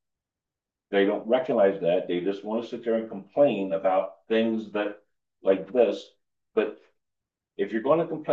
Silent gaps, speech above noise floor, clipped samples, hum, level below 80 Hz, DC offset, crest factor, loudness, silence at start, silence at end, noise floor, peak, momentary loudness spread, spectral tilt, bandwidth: none; 64 dB; under 0.1%; none; -78 dBFS; under 0.1%; 18 dB; -26 LUFS; 0.9 s; 0 s; -89 dBFS; -8 dBFS; 9 LU; -7.5 dB/octave; 7.2 kHz